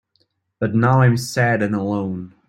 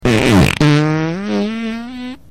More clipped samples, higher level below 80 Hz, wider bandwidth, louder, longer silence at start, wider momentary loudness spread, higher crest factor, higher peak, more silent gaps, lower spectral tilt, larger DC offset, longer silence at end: neither; second, -54 dBFS vs -32 dBFS; second, 14.5 kHz vs 16 kHz; second, -19 LUFS vs -14 LUFS; first, 0.6 s vs 0 s; second, 10 LU vs 15 LU; first, 16 dB vs 10 dB; about the same, -2 dBFS vs -4 dBFS; neither; about the same, -7 dB/octave vs -6 dB/octave; neither; about the same, 0.2 s vs 0.15 s